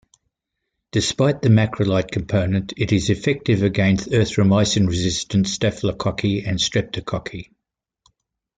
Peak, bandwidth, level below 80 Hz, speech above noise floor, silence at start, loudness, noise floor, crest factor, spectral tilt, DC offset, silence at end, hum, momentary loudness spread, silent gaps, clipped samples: -4 dBFS; 9.4 kHz; -46 dBFS; 60 dB; 0.95 s; -20 LUFS; -79 dBFS; 16 dB; -5.5 dB/octave; under 0.1%; 1.15 s; none; 7 LU; none; under 0.1%